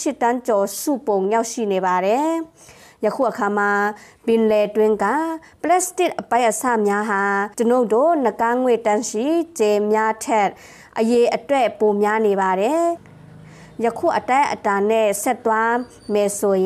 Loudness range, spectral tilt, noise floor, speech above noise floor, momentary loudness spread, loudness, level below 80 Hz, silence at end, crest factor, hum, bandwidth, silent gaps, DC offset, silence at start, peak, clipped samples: 2 LU; -4.5 dB/octave; -42 dBFS; 23 dB; 6 LU; -19 LUFS; -62 dBFS; 0 s; 12 dB; none; 15.5 kHz; none; under 0.1%; 0 s; -8 dBFS; under 0.1%